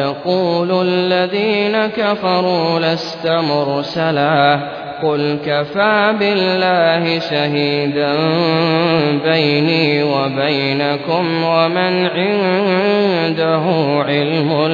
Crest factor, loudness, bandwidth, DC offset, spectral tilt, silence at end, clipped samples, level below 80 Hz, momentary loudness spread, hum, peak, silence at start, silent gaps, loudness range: 14 dB; -15 LUFS; 5.4 kHz; under 0.1%; -7 dB/octave; 0 s; under 0.1%; -60 dBFS; 4 LU; none; -2 dBFS; 0 s; none; 1 LU